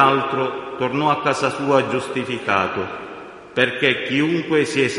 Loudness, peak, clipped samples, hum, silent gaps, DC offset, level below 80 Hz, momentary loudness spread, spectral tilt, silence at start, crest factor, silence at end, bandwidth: -20 LUFS; 0 dBFS; under 0.1%; none; none; under 0.1%; -58 dBFS; 10 LU; -5 dB/octave; 0 s; 20 dB; 0 s; 11.5 kHz